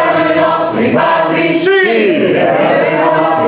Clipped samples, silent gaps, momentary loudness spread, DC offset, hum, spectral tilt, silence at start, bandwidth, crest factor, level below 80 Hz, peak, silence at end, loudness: under 0.1%; none; 2 LU; under 0.1%; none; -9.5 dB/octave; 0 s; 4 kHz; 10 dB; -54 dBFS; 0 dBFS; 0 s; -10 LUFS